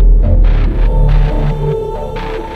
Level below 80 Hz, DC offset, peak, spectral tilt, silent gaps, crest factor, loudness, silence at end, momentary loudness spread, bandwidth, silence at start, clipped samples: -10 dBFS; under 0.1%; 0 dBFS; -9 dB/octave; none; 10 dB; -15 LUFS; 0 s; 9 LU; 4.6 kHz; 0 s; under 0.1%